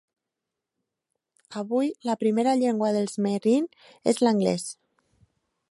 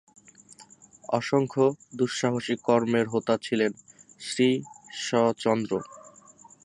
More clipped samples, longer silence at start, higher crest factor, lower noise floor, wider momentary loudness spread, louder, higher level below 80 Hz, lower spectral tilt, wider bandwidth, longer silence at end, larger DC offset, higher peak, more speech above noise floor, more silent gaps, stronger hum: neither; first, 1.5 s vs 0.6 s; about the same, 20 dB vs 20 dB; first, -86 dBFS vs -53 dBFS; about the same, 13 LU vs 11 LU; about the same, -25 LUFS vs -26 LUFS; about the same, -74 dBFS vs -70 dBFS; about the same, -5.5 dB/octave vs -5 dB/octave; about the same, 11.5 kHz vs 11.5 kHz; first, 0.95 s vs 0.55 s; neither; about the same, -8 dBFS vs -8 dBFS; first, 61 dB vs 28 dB; neither; neither